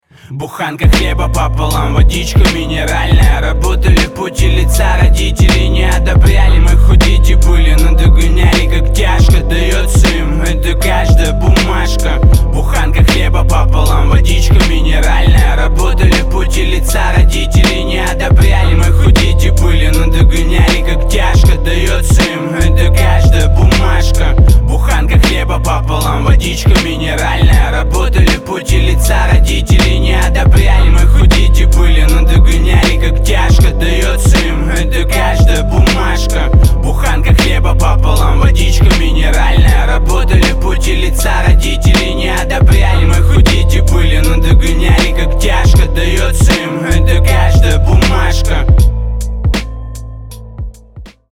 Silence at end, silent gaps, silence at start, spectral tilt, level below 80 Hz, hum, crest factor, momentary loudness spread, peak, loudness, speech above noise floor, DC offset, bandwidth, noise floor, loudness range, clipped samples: 0.25 s; none; 0.3 s; -5 dB/octave; -10 dBFS; none; 8 dB; 5 LU; 0 dBFS; -11 LUFS; 25 dB; under 0.1%; 15.5 kHz; -33 dBFS; 2 LU; under 0.1%